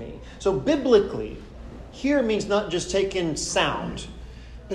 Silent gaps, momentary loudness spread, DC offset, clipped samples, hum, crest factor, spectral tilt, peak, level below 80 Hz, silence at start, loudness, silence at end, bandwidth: none; 22 LU; under 0.1%; under 0.1%; none; 18 dB; -4.5 dB/octave; -6 dBFS; -42 dBFS; 0 s; -24 LUFS; 0 s; 11.5 kHz